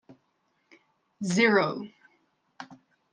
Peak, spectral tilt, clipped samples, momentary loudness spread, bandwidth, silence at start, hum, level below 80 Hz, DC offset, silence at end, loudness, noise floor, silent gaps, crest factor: -8 dBFS; -5 dB/octave; under 0.1%; 25 LU; 10 kHz; 0.1 s; none; -78 dBFS; under 0.1%; 0.4 s; -25 LUFS; -73 dBFS; none; 22 dB